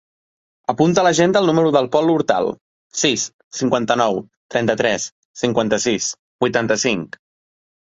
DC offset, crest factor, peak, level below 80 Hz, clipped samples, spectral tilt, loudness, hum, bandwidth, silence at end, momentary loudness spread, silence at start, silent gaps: under 0.1%; 18 dB; -2 dBFS; -56 dBFS; under 0.1%; -4 dB/octave; -18 LUFS; none; 8.2 kHz; 0.9 s; 11 LU; 0.7 s; 2.61-2.90 s, 3.33-3.51 s, 4.37-4.49 s, 5.12-5.34 s, 6.19-6.39 s